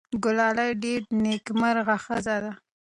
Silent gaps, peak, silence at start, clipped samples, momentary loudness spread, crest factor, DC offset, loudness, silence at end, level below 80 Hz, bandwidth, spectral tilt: none; -12 dBFS; 0.1 s; under 0.1%; 7 LU; 14 dB; under 0.1%; -25 LUFS; 0.4 s; -60 dBFS; 11 kHz; -5 dB/octave